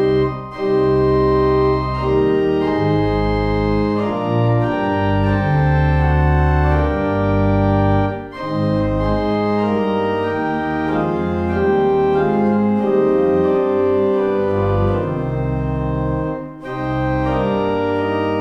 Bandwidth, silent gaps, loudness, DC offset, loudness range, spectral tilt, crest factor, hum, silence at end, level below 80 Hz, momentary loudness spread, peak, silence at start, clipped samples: 6.6 kHz; none; -17 LUFS; 0.1%; 3 LU; -9.5 dB/octave; 12 dB; none; 0 s; -28 dBFS; 5 LU; -4 dBFS; 0 s; under 0.1%